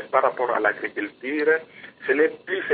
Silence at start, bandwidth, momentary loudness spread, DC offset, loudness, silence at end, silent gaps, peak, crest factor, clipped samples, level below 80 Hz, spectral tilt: 0 s; 4.7 kHz; 9 LU; under 0.1%; -23 LUFS; 0 s; none; -4 dBFS; 20 dB; under 0.1%; -76 dBFS; -8.5 dB/octave